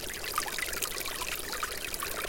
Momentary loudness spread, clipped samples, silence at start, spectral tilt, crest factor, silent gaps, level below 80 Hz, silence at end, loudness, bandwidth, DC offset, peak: 2 LU; under 0.1%; 0 s; -0.5 dB/octave; 28 dB; none; -50 dBFS; 0 s; -33 LUFS; 17 kHz; under 0.1%; -8 dBFS